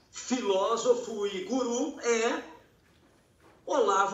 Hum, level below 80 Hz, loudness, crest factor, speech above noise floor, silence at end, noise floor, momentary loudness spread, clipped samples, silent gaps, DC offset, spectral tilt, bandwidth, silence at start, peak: none; -70 dBFS; -29 LUFS; 18 dB; 35 dB; 0 s; -63 dBFS; 8 LU; under 0.1%; none; under 0.1%; -2.5 dB/octave; 8.2 kHz; 0.15 s; -12 dBFS